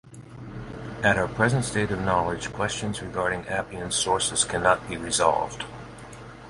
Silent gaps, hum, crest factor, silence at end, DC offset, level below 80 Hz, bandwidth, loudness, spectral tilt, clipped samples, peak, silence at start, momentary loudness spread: none; none; 22 dB; 0 s; under 0.1%; -48 dBFS; 11.5 kHz; -25 LUFS; -3.5 dB/octave; under 0.1%; -6 dBFS; 0.05 s; 18 LU